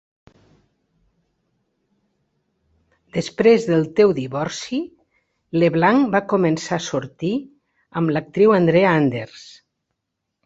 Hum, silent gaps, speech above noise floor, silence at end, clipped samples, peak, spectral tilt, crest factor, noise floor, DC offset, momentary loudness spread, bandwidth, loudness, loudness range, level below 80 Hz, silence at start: none; none; 61 dB; 1 s; under 0.1%; -2 dBFS; -6.5 dB/octave; 20 dB; -79 dBFS; under 0.1%; 13 LU; 8 kHz; -19 LUFS; 4 LU; -60 dBFS; 3.15 s